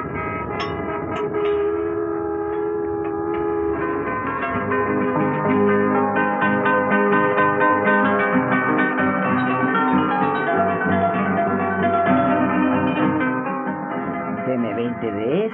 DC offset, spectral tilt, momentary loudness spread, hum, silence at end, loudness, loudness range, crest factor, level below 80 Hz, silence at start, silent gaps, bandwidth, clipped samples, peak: under 0.1%; -5.5 dB/octave; 8 LU; none; 0 s; -20 LUFS; 5 LU; 14 dB; -52 dBFS; 0 s; none; 5.8 kHz; under 0.1%; -6 dBFS